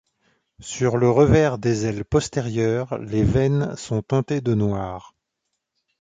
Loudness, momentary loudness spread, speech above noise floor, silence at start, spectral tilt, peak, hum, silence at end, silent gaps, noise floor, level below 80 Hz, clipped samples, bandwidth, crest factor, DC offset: -21 LUFS; 11 LU; 58 dB; 0.6 s; -7 dB/octave; -2 dBFS; none; 1 s; none; -79 dBFS; -40 dBFS; under 0.1%; 9.4 kHz; 18 dB; under 0.1%